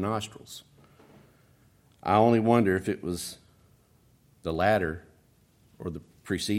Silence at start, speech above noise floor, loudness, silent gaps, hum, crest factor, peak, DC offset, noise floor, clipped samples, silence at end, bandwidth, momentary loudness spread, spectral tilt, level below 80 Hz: 0 s; 36 dB; -27 LUFS; none; none; 22 dB; -8 dBFS; under 0.1%; -62 dBFS; under 0.1%; 0 s; 16 kHz; 22 LU; -6 dB/octave; -60 dBFS